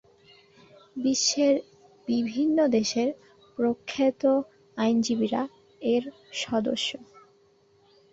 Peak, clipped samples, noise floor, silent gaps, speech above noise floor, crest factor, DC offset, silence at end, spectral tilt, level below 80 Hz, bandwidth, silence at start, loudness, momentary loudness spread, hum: -12 dBFS; under 0.1%; -62 dBFS; none; 37 dB; 16 dB; under 0.1%; 1.1 s; -3.5 dB/octave; -68 dBFS; 8 kHz; 0.95 s; -26 LUFS; 14 LU; none